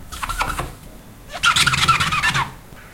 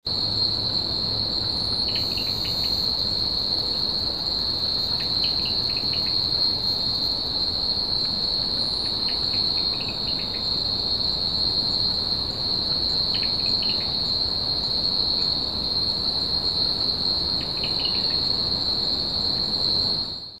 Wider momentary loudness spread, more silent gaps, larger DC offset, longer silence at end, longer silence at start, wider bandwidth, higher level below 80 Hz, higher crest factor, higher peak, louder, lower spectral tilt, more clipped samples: first, 14 LU vs 3 LU; neither; second, under 0.1% vs 0.4%; about the same, 0 s vs 0 s; about the same, 0 s vs 0.05 s; about the same, 17 kHz vs 15.5 kHz; first, -36 dBFS vs -44 dBFS; first, 20 dB vs 14 dB; first, -2 dBFS vs -10 dBFS; first, -18 LUFS vs -21 LUFS; second, -1.5 dB/octave vs -4 dB/octave; neither